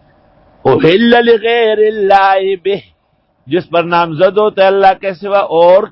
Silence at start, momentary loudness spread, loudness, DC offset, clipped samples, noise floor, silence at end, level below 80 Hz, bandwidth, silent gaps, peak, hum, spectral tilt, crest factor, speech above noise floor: 0.65 s; 10 LU; -10 LUFS; under 0.1%; 0.2%; -57 dBFS; 0.05 s; -50 dBFS; 5.8 kHz; none; 0 dBFS; none; -7.5 dB/octave; 10 dB; 48 dB